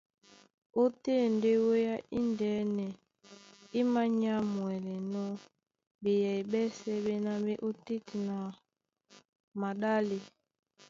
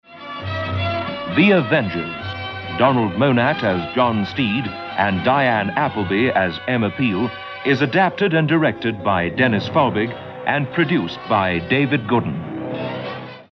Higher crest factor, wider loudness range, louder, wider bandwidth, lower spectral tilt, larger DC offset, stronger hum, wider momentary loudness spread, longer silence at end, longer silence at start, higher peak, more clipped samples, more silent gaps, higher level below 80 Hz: about the same, 16 dB vs 16 dB; first, 5 LU vs 1 LU; second, -33 LUFS vs -19 LUFS; first, 7.6 kHz vs 6.2 kHz; about the same, -7 dB/octave vs -8 dB/octave; neither; neither; about the same, 11 LU vs 10 LU; first, 0.6 s vs 0.1 s; first, 0.75 s vs 0.1 s; second, -18 dBFS vs -2 dBFS; neither; first, 5.87-5.99 s, 9.29-9.33 s, 9.40-9.52 s vs none; second, -72 dBFS vs -54 dBFS